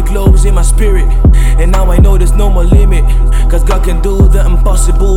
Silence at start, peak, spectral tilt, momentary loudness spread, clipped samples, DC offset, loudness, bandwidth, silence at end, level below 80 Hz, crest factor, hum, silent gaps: 0 s; 0 dBFS; -6.5 dB/octave; 3 LU; 0.4%; under 0.1%; -10 LUFS; 12.5 kHz; 0 s; -6 dBFS; 6 dB; none; none